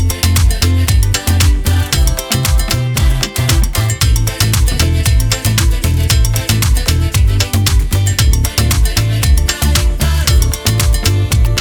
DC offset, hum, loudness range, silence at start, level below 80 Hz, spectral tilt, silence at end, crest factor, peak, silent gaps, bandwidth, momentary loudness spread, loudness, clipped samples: under 0.1%; none; 1 LU; 0 s; -14 dBFS; -4 dB/octave; 0 s; 10 dB; 0 dBFS; none; over 20 kHz; 2 LU; -13 LUFS; under 0.1%